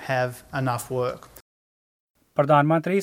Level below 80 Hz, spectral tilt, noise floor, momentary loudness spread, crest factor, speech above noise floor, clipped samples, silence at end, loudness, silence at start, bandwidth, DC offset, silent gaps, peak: -60 dBFS; -6.5 dB/octave; under -90 dBFS; 11 LU; 20 dB; over 67 dB; under 0.1%; 0 s; -24 LUFS; 0 s; 16.5 kHz; under 0.1%; 1.41-2.14 s; -6 dBFS